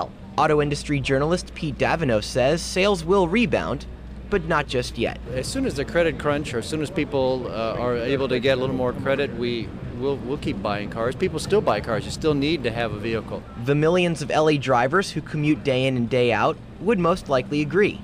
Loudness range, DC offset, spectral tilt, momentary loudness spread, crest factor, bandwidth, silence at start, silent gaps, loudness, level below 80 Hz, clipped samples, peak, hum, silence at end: 3 LU; under 0.1%; -5.5 dB/octave; 8 LU; 14 dB; 15.5 kHz; 0 s; none; -23 LUFS; -40 dBFS; under 0.1%; -8 dBFS; none; 0 s